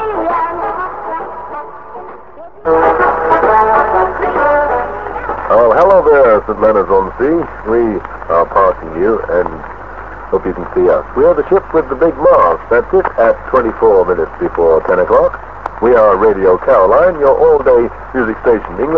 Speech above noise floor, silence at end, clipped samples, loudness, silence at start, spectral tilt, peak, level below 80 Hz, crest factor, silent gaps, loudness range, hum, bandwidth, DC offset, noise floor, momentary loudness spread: 23 dB; 0 s; under 0.1%; -11 LUFS; 0 s; -8.5 dB/octave; 0 dBFS; -34 dBFS; 12 dB; none; 4 LU; none; 5.6 kHz; 1%; -34 dBFS; 13 LU